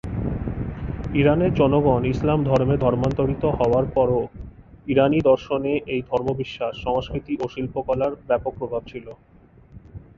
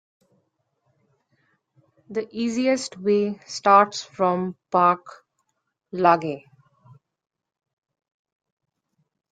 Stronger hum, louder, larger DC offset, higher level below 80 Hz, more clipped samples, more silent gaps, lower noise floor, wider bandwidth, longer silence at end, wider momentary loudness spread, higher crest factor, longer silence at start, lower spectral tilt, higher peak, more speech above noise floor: neither; about the same, -22 LUFS vs -22 LUFS; neither; first, -38 dBFS vs -72 dBFS; neither; neither; second, -47 dBFS vs -77 dBFS; second, 7.4 kHz vs 9.4 kHz; second, 0.2 s vs 2.95 s; about the same, 12 LU vs 14 LU; about the same, 18 dB vs 22 dB; second, 0.05 s vs 2.1 s; first, -9 dB/octave vs -5 dB/octave; about the same, -4 dBFS vs -2 dBFS; second, 26 dB vs 56 dB